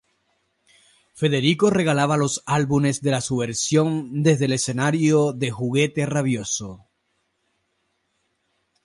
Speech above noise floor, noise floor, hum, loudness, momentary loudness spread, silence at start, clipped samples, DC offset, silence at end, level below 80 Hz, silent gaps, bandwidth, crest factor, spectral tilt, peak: 51 dB; -72 dBFS; none; -21 LUFS; 6 LU; 1.15 s; under 0.1%; under 0.1%; 2.1 s; -58 dBFS; none; 11.5 kHz; 16 dB; -5 dB/octave; -6 dBFS